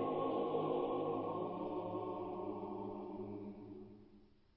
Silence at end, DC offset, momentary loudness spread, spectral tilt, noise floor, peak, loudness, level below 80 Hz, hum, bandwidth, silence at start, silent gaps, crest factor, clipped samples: 0.3 s; under 0.1%; 15 LU; -7 dB/octave; -65 dBFS; -26 dBFS; -42 LUFS; -72 dBFS; none; 5.4 kHz; 0 s; none; 16 dB; under 0.1%